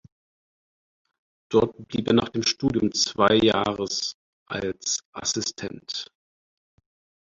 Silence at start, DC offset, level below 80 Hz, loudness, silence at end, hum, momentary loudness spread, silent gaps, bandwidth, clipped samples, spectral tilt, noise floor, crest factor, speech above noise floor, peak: 1.5 s; under 0.1%; -56 dBFS; -24 LUFS; 1.2 s; none; 13 LU; 4.14-4.46 s, 5.05-5.13 s; 7.8 kHz; under 0.1%; -3.5 dB/octave; under -90 dBFS; 22 dB; over 66 dB; -4 dBFS